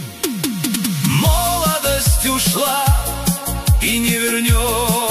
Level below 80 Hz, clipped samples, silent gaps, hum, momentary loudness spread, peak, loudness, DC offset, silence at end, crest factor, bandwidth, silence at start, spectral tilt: -24 dBFS; under 0.1%; none; none; 5 LU; -2 dBFS; -16 LUFS; 0.2%; 0 s; 16 dB; 15.5 kHz; 0 s; -4 dB/octave